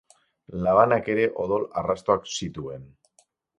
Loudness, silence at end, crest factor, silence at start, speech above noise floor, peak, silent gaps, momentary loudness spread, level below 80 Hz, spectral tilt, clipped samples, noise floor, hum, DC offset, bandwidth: -24 LUFS; 0.75 s; 22 dB; 0.5 s; 41 dB; -4 dBFS; none; 18 LU; -54 dBFS; -5 dB/octave; under 0.1%; -65 dBFS; none; under 0.1%; 11 kHz